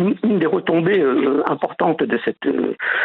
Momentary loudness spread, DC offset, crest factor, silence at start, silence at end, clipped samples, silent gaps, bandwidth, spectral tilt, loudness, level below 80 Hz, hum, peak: 5 LU; under 0.1%; 18 dB; 0 s; 0 s; under 0.1%; none; 4.3 kHz; -9.5 dB/octave; -19 LUFS; -64 dBFS; none; 0 dBFS